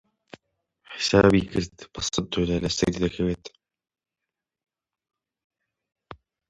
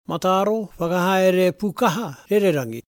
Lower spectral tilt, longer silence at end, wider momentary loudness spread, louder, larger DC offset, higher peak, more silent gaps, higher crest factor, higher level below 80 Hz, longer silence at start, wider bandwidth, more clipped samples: about the same, -5 dB/octave vs -5.5 dB/octave; first, 0.35 s vs 0.05 s; first, 14 LU vs 6 LU; second, -24 LUFS vs -20 LUFS; neither; about the same, -4 dBFS vs -4 dBFS; first, 5.44-5.50 s vs none; first, 24 dB vs 16 dB; first, -46 dBFS vs -58 dBFS; first, 0.9 s vs 0.1 s; second, 11 kHz vs 18 kHz; neither